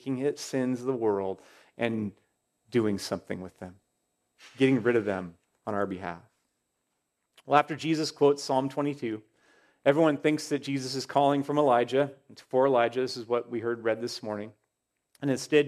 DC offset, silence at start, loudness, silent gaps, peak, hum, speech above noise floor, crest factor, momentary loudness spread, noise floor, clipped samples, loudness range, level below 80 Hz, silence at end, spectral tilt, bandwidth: under 0.1%; 0.05 s; -28 LUFS; none; -6 dBFS; none; 54 dB; 24 dB; 14 LU; -81 dBFS; under 0.1%; 5 LU; -76 dBFS; 0 s; -5.5 dB/octave; 14 kHz